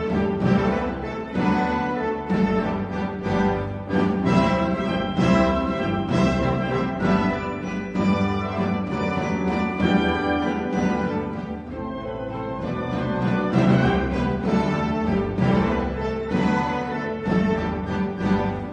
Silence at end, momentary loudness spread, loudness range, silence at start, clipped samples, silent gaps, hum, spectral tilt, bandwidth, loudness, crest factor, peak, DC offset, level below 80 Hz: 0 s; 8 LU; 3 LU; 0 s; under 0.1%; none; none; -7.5 dB/octave; 8.4 kHz; -23 LUFS; 16 dB; -6 dBFS; under 0.1%; -38 dBFS